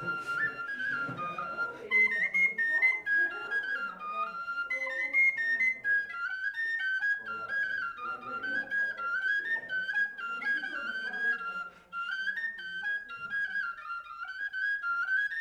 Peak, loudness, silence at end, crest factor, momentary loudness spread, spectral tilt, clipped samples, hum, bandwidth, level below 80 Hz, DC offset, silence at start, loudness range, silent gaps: -16 dBFS; -30 LUFS; 0 s; 16 dB; 11 LU; -3 dB/octave; under 0.1%; none; 13 kHz; -74 dBFS; under 0.1%; 0 s; 6 LU; none